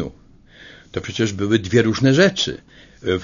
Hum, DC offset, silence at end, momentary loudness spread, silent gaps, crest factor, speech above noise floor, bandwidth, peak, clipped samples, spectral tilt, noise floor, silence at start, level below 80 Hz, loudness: none; under 0.1%; 0 s; 16 LU; none; 18 dB; 29 dB; 7.4 kHz; 0 dBFS; under 0.1%; -5.5 dB/octave; -47 dBFS; 0 s; -48 dBFS; -18 LUFS